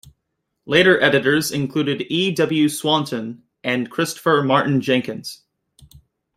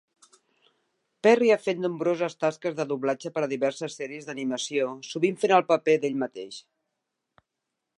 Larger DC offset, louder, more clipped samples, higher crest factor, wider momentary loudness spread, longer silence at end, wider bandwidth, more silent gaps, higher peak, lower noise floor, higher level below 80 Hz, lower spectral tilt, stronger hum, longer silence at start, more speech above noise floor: neither; first, -18 LUFS vs -26 LUFS; neither; about the same, 20 dB vs 22 dB; about the same, 14 LU vs 13 LU; second, 1 s vs 1.4 s; first, 16 kHz vs 11 kHz; neither; first, 0 dBFS vs -6 dBFS; second, -76 dBFS vs -84 dBFS; first, -60 dBFS vs -82 dBFS; about the same, -4.5 dB/octave vs -5 dB/octave; neither; second, 0.65 s vs 1.25 s; about the same, 57 dB vs 58 dB